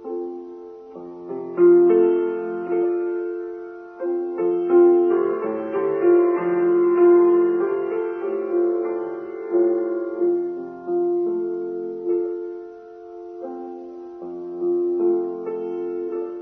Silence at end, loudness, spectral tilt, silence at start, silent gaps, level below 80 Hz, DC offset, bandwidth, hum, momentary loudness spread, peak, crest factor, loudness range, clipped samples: 0 s; -21 LUFS; -10.5 dB/octave; 0 s; none; -72 dBFS; under 0.1%; 3 kHz; none; 20 LU; -6 dBFS; 14 dB; 9 LU; under 0.1%